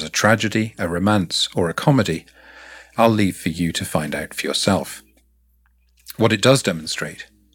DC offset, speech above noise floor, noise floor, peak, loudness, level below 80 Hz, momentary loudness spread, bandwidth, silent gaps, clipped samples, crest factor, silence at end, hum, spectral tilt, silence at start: under 0.1%; 40 dB; -59 dBFS; -2 dBFS; -19 LUFS; -50 dBFS; 15 LU; 18.5 kHz; none; under 0.1%; 20 dB; 0.3 s; none; -4.5 dB/octave; 0 s